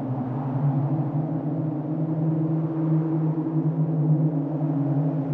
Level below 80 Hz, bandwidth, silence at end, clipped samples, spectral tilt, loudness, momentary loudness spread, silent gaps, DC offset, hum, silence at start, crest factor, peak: -62 dBFS; 2.7 kHz; 0 s; under 0.1%; -13 dB/octave; -25 LUFS; 5 LU; none; under 0.1%; none; 0 s; 12 dB; -12 dBFS